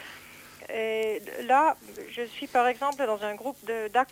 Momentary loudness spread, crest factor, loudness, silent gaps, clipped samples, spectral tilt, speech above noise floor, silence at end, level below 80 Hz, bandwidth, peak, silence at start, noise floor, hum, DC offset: 18 LU; 18 dB; -28 LUFS; none; under 0.1%; -3 dB/octave; 20 dB; 0.05 s; -70 dBFS; 17 kHz; -12 dBFS; 0 s; -48 dBFS; none; under 0.1%